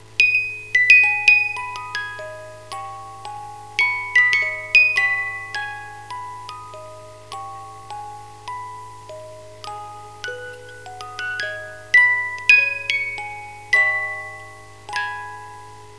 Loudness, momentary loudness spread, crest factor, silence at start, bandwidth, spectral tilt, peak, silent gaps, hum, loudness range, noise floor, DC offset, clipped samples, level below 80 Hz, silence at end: -16 LUFS; 24 LU; 22 dB; 0.1 s; 11 kHz; -1 dB/octave; 0 dBFS; none; none; 17 LU; -41 dBFS; 0.4%; under 0.1%; -58 dBFS; 0 s